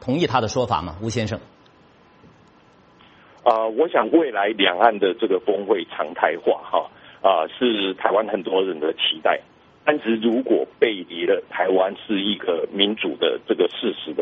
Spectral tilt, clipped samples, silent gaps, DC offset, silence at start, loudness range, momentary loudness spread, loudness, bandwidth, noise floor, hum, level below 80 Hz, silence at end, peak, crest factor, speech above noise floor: -2.5 dB/octave; under 0.1%; none; under 0.1%; 0 s; 5 LU; 7 LU; -21 LUFS; 8 kHz; -53 dBFS; none; -58 dBFS; 0 s; 0 dBFS; 22 dB; 32 dB